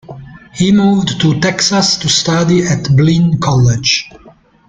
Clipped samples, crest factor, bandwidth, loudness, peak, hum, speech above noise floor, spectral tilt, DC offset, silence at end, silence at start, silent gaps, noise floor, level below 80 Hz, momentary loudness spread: under 0.1%; 12 dB; 9.4 kHz; -11 LUFS; 0 dBFS; none; 32 dB; -4.5 dB/octave; under 0.1%; 0.4 s; 0.1 s; none; -43 dBFS; -40 dBFS; 4 LU